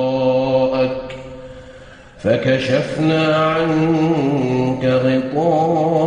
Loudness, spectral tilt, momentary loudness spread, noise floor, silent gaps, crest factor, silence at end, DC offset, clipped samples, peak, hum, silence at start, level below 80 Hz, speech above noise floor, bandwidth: -17 LUFS; -7.5 dB/octave; 11 LU; -40 dBFS; none; 12 dB; 0 s; under 0.1%; under 0.1%; -4 dBFS; none; 0 s; -46 dBFS; 24 dB; 9.8 kHz